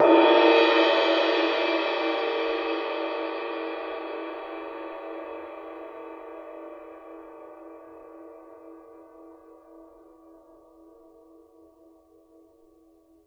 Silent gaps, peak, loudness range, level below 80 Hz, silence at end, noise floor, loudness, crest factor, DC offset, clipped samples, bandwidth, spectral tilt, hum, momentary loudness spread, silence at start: none; -6 dBFS; 26 LU; -70 dBFS; 3.45 s; -59 dBFS; -24 LUFS; 22 dB; under 0.1%; under 0.1%; 7 kHz; -3.5 dB/octave; none; 28 LU; 0 s